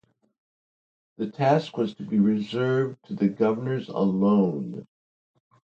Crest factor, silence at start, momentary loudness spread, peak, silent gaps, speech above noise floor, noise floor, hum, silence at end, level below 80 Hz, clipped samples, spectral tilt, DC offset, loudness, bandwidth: 18 dB; 1.2 s; 12 LU; -8 dBFS; none; over 66 dB; under -90 dBFS; none; 0.85 s; -68 dBFS; under 0.1%; -8.5 dB/octave; under 0.1%; -25 LUFS; 7.4 kHz